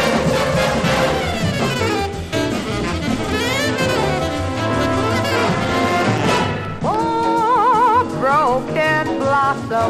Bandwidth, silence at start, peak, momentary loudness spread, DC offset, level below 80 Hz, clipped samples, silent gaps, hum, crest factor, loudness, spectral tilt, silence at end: 15.5 kHz; 0 s; -4 dBFS; 6 LU; under 0.1%; -38 dBFS; under 0.1%; none; none; 14 dB; -17 LUFS; -5 dB/octave; 0 s